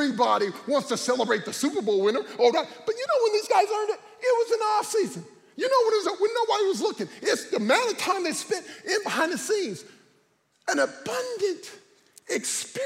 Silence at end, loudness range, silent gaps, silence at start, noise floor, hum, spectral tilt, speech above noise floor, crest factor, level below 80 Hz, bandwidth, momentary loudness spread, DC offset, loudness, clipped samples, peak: 0 s; 4 LU; none; 0 s; -66 dBFS; none; -2.5 dB/octave; 41 dB; 18 dB; -80 dBFS; 16 kHz; 9 LU; under 0.1%; -25 LUFS; under 0.1%; -8 dBFS